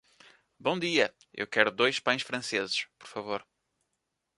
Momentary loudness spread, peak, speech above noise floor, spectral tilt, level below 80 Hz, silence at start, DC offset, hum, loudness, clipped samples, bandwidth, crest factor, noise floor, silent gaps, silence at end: 13 LU; -4 dBFS; 52 dB; -3 dB/octave; -76 dBFS; 0.6 s; under 0.1%; none; -29 LUFS; under 0.1%; 11.5 kHz; 28 dB; -82 dBFS; none; 0.95 s